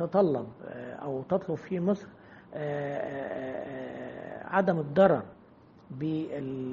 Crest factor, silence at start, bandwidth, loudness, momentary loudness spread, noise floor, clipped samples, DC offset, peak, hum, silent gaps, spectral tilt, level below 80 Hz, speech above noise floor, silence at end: 22 dB; 0 s; 7 kHz; -31 LUFS; 17 LU; -56 dBFS; under 0.1%; under 0.1%; -8 dBFS; none; none; -7 dB/octave; -68 dBFS; 26 dB; 0 s